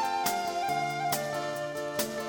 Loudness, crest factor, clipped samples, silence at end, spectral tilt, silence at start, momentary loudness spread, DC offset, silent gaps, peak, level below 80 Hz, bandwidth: -31 LUFS; 16 dB; under 0.1%; 0 s; -3 dB/octave; 0 s; 4 LU; under 0.1%; none; -14 dBFS; -68 dBFS; 19.5 kHz